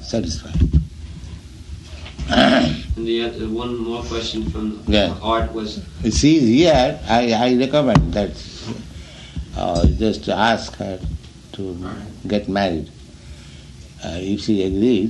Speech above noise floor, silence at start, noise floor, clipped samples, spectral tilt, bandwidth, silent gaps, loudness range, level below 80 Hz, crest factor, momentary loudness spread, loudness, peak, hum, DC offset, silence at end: 20 dB; 0 s; -39 dBFS; under 0.1%; -5.5 dB/octave; 11 kHz; none; 8 LU; -30 dBFS; 18 dB; 21 LU; -19 LUFS; -2 dBFS; none; under 0.1%; 0 s